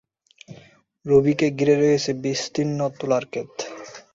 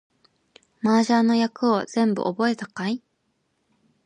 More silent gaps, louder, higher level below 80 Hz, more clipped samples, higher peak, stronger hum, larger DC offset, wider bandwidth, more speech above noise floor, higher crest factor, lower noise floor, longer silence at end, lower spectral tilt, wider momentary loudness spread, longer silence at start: neither; about the same, -21 LUFS vs -23 LUFS; first, -60 dBFS vs -72 dBFS; neither; about the same, -6 dBFS vs -8 dBFS; neither; neither; second, 7.8 kHz vs 9.8 kHz; second, 31 dB vs 50 dB; about the same, 18 dB vs 16 dB; second, -52 dBFS vs -72 dBFS; second, 0.15 s vs 1.1 s; about the same, -5.5 dB/octave vs -5.5 dB/octave; first, 15 LU vs 10 LU; second, 0.5 s vs 0.85 s